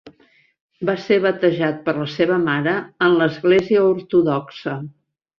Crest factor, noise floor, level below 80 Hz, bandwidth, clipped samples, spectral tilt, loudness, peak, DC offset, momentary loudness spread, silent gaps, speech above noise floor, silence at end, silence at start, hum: 16 dB; -57 dBFS; -60 dBFS; 6.8 kHz; under 0.1%; -7.5 dB/octave; -19 LUFS; -4 dBFS; under 0.1%; 11 LU; 0.60-0.69 s; 39 dB; 0.5 s; 0.05 s; none